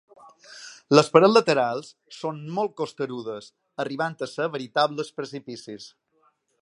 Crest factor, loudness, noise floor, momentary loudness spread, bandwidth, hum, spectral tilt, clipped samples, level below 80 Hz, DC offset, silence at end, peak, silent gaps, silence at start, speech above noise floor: 24 dB; -24 LUFS; -67 dBFS; 23 LU; 11 kHz; none; -5 dB/octave; under 0.1%; -74 dBFS; under 0.1%; 0.75 s; 0 dBFS; none; 0.5 s; 43 dB